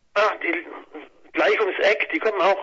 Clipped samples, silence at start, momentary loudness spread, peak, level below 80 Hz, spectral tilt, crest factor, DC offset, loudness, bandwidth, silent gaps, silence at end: under 0.1%; 0.15 s; 18 LU; -6 dBFS; -68 dBFS; -3 dB/octave; 16 dB; under 0.1%; -21 LUFS; 7.6 kHz; none; 0 s